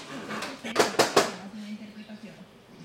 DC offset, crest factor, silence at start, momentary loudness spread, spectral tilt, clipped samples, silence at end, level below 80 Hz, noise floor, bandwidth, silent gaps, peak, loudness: under 0.1%; 24 dB; 0 s; 21 LU; -2.5 dB/octave; under 0.1%; 0 s; -70 dBFS; -49 dBFS; 16.5 kHz; none; -4 dBFS; -26 LUFS